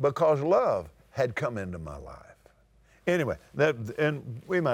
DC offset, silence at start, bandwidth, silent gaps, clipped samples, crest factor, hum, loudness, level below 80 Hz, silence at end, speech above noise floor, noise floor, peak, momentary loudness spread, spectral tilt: under 0.1%; 0 s; 15.5 kHz; none; under 0.1%; 16 dB; none; -28 LUFS; -56 dBFS; 0 s; 34 dB; -61 dBFS; -12 dBFS; 16 LU; -7 dB/octave